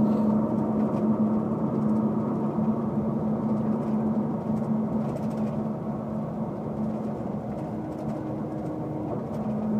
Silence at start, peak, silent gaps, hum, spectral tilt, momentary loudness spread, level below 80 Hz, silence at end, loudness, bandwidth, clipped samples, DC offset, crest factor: 0 s; -12 dBFS; none; none; -10.5 dB/octave; 7 LU; -54 dBFS; 0 s; -28 LUFS; 4.2 kHz; under 0.1%; under 0.1%; 14 dB